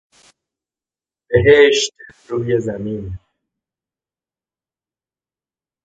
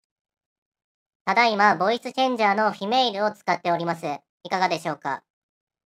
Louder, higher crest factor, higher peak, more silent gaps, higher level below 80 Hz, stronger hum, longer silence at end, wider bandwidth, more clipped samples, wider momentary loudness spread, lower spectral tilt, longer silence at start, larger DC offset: first, -15 LUFS vs -23 LUFS; about the same, 20 dB vs 22 dB; first, 0 dBFS vs -4 dBFS; second, none vs 4.29-4.40 s; first, -44 dBFS vs -78 dBFS; neither; first, 2.65 s vs 0.75 s; second, 9.2 kHz vs 14.5 kHz; neither; first, 18 LU vs 12 LU; about the same, -4.5 dB/octave vs -4.5 dB/octave; about the same, 1.3 s vs 1.25 s; neither